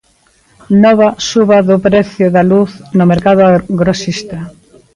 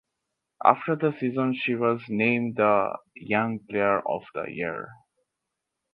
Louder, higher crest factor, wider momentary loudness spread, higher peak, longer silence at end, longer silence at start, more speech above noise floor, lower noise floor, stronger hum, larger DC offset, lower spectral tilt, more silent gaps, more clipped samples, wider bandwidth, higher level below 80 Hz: first, -10 LUFS vs -25 LUFS; second, 10 dB vs 26 dB; about the same, 11 LU vs 10 LU; about the same, 0 dBFS vs -2 dBFS; second, 0.45 s vs 1 s; about the same, 0.7 s vs 0.6 s; second, 42 dB vs 58 dB; second, -52 dBFS vs -84 dBFS; neither; neither; second, -6.5 dB/octave vs -9 dB/octave; neither; neither; first, 10.5 kHz vs 5.2 kHz; first, -42 dBFS vs -68 dBFS